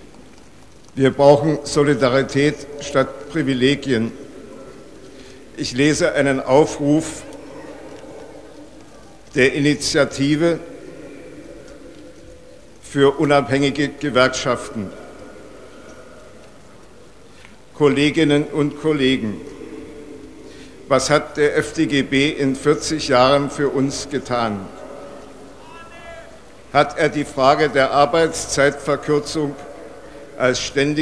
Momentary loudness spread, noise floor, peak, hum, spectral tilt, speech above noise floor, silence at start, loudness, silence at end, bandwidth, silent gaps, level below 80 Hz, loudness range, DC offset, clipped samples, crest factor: 23 LU; -46 dBFS; 0 dBFS; none; -5 dB/octave; 29 dB; 0.95 s; -18 LUFS; 0 s; 11 kHz; none; -46 dBFS; 6 LU; 0.5%; under 0.1%; 20 dB